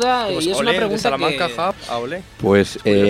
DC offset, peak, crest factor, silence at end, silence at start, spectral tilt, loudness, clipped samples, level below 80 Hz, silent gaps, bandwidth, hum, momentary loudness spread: under 0.1%; 0 dBFS; 18 dB; 0 s; 0 s; -4.5 dB/octave; -19 LUFS; under 0.1%; -46 dBFS; none; 15.5 kHz; none; 9 LU